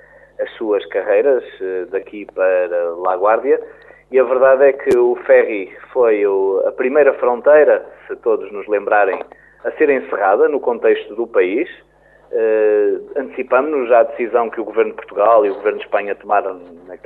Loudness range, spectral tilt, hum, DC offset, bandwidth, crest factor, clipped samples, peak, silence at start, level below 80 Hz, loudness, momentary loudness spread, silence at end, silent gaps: 4 LU; -6.5 dB/octave; none; under 0.1%; 4.2 kHz; 14 dB; under 0.1%; -2 dBFS; 0.4 s; -60 dBFS; -16 LUFS; 12 LU; 0.1 s; none